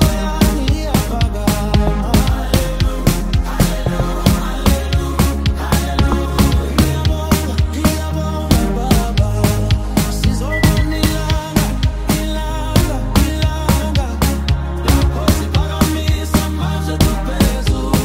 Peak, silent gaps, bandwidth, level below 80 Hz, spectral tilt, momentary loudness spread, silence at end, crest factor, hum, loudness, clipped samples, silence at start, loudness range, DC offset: 0 dBFS; none; 16.5 kHz; -18 dBFS; -5.5 dB/octave; 4 LU; 0 s; 14 dB; none; -16 LUFS; under 0.1%; 0 s; 1 LU; under 0.1%